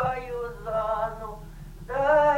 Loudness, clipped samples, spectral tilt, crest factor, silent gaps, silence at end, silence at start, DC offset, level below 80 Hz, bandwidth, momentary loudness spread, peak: -27 LUFS; under 0.1%; -6 dB/octave; 16 dB; none; 0 s; 0 s; under 0.1%; -44 dBFS; 16.5 kHz; 21 LU; -10 dBFS